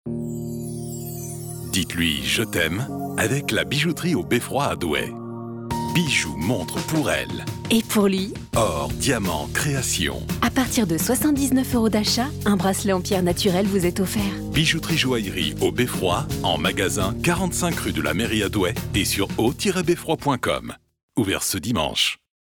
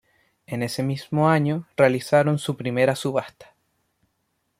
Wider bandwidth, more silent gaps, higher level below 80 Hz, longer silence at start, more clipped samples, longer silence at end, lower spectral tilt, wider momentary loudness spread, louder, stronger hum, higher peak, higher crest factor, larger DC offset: first, 19.5 kHz vs 15.5 kHz; first, 21.03-21.08 s vs none; first, -42 dBFS vs -64 dBFS; second, 0.05 s vs 0.5 s; neither; second, 0.35 s vs 1.15 s; second, -4 dB/octave vs -6.5 dB/octave; about the same, 9 LU vs 9 LU; about the same, -22 LUFS vs -22 LUFS; neither; second, -8 dBFS vs -4 dBFS; second, 14 dB vs 20 dB; neither